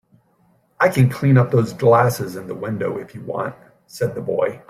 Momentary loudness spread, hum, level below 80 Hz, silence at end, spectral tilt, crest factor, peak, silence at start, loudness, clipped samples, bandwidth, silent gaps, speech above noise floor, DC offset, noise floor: 14 LU; none; -54 dBFS; 0.1 s; -7.5 dB/octave; 18 dB; -2 dBFS; 0.8 s; -19 LUFS; under 0.1%; 15 kHz; none; 41 dB; under 0.1%; -60 dBFS